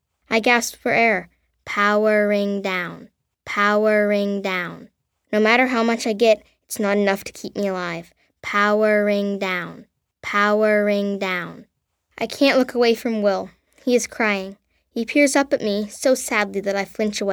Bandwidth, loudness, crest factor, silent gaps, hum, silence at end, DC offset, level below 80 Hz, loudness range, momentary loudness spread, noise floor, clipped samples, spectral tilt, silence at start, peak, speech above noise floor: 20 kHz; -20 LUFS; 18 dB; none; none; 0 s; under 0.1%; -62 dBFS; 2 LU; 12 LU; -54 dBFS; under 0.1%; -4 dB/octave; 0.3 s; -2 dBFS; 34 dB